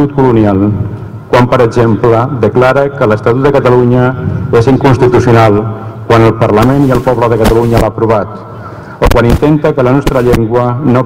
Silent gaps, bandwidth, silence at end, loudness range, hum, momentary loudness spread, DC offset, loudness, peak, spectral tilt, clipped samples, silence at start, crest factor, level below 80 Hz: none; 16 kHz; 0 s; 2 LU; none; 7 LU; under 0.1%; -8 LUFS; 0 dBFS; -8 dB/octave; 0.7%; 0 s; 8 dB; -24 dBFS